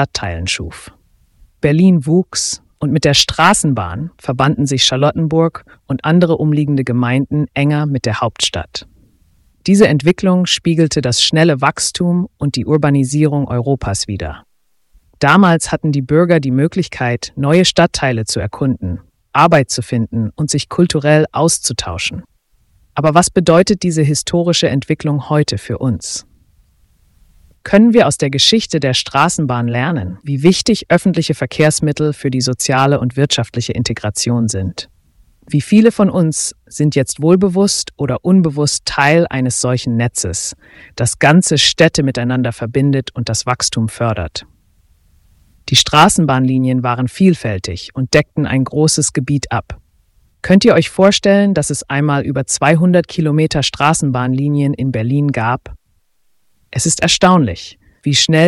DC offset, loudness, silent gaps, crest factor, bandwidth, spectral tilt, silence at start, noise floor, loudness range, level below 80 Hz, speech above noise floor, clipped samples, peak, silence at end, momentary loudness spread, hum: under 0.1%; -14 LUFS; none; 14 dB; 12 kHz; -4.5 dB/octave; 0 s; -58 dBFS; 3 LU; -40 dBFS; 44 dB; under 0.1%; 0 dBFS; 0 s; 10 LU; none